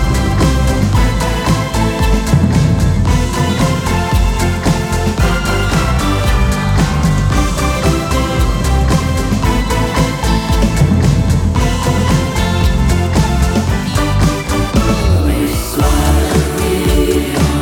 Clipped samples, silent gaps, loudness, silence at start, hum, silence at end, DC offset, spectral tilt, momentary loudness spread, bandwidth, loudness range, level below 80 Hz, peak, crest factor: under 0.1%; none; -14 LUFS; 0 s; none; 0 s; under 0.1%; -5.5 dB/octave; 3 LU; 18 kHz; 1 LU; -16 dBFS; 0 dBFS; 12 dB